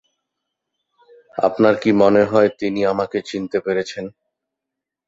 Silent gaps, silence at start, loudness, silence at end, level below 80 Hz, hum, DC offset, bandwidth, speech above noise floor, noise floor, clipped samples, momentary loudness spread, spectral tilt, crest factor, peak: none; 1.35 s; -18 LUFS; 1 s; -58 dBFS; none; under 0.1%; 7.8 kHz; 66 dB; -84 dBFS; under 0.1%; 15 LU; -6.5 dB/octave; 18 dB; -2 dBFS